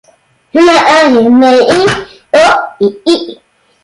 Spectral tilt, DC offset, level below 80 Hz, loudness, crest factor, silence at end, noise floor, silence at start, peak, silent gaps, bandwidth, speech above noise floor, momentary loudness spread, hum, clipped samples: -4 dB/octave; under 0.1%; -46 dBFS; -8 LUFS; 8 dB; 0.5 s; -48 dBFS; 0.55 s; 0 dBFS; none; 11.5 kHz; 42 dB; 8 LU; none; under 0.1%